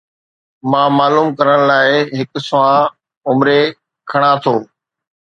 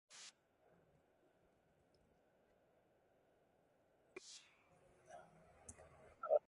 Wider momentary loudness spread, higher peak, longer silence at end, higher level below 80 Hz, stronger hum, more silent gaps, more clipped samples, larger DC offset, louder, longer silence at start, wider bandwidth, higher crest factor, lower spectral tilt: about the same, 9 LU vs 11 LU; first, 0 dBFS vs -24 dBFS; first, 0.6 s vs 0.1 s; first, -62 dBFS vs -82 dBFS; neither; first, 3.17-3.21 s vs none; neither; neither; first, -13 LUFS vs -52 LUFS; first, 0.65 s vs 0.1 s; second, 8.8 kHz vs 11 kHz; second, 14 dB vs 28 dB; first, -6.5 dB/octave vs -3 dB/octave